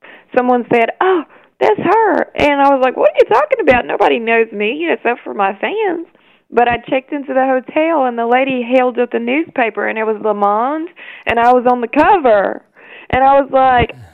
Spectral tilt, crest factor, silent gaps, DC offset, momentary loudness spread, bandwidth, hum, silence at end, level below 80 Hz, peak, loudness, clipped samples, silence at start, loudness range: -6.5 dB/octave; 14 dB; none; under 0.1%; 8 LU; 7.8 kHz; none; 0.1 s; -42 dBFS; 0 dBFS; -14 LUFS; under 0.1%; 0.1 s; 4 LU